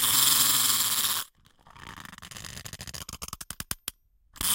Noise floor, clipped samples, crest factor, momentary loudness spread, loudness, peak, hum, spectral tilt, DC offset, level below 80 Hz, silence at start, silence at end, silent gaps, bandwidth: -57 dBFS; under 0.1%; 22 dB; 24 LU; -23 LUFS; -6 dBFS; none; 0.5 dB/octave; under 0.1%; -54 dBFS; 0 s; 0 s; none; 17 kHz